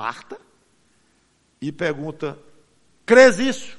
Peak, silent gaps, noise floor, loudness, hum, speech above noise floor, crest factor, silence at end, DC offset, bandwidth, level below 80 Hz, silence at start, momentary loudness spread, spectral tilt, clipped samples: 0 dBFS; none; -63 dBFS; -17 LUFS; none; 44 dB; 22 dB; 0 s; under 0.1%; 11.5 kHz; -60 dBFS; 0 s; 22 LU; -4 dB/octave; under 0.1%